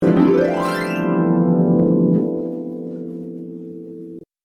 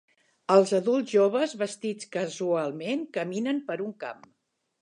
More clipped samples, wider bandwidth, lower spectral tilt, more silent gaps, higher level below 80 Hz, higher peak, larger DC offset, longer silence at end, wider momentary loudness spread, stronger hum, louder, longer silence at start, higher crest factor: neither; about the same, 11.5 kHz vs 11 kHz; first, -8.5 dB/octave vs -5 dB/octave; neither; first, -54 dBFS vs -82 dBFS; first, -2 dBFS vs -6 dBFS; neither; second, 0.2 s vs 0.7 s; first, 18 LU vs 12 LU; neither; first, -18 LUFS vs -27 LUFS; second, 0 s vs 0.5 s; about the same, 16 dB vs 20 dB